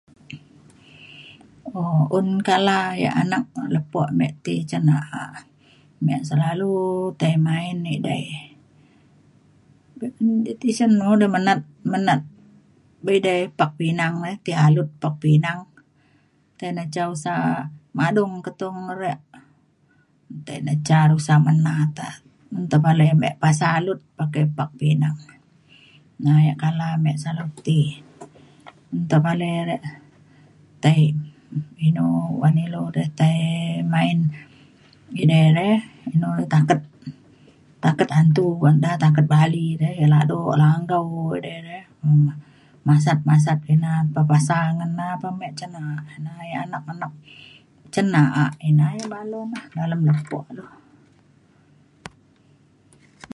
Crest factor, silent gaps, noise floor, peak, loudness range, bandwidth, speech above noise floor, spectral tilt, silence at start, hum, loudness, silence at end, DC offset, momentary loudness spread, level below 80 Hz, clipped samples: 18 dB; none; -60 dBFS; -2 dBFS; 7 LU; 11.5 kHz; 40 dB; -7 dB/octave; 0.3 s; none; -20 LUFS; 1.25 s; under 0.1%; 16 LU; -62 dBFS; under 0.1%